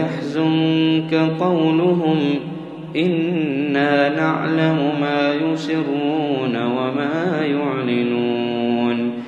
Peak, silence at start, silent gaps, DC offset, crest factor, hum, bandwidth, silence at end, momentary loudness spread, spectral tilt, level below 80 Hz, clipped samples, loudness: -2 dBFS; 0 s; none; under 0.1%; 16 dB; none; 7.6 kHz; 0 s; 4 LU; -7.5 dB/octave; -66 dBFS; under 0.1%; -19 LUFS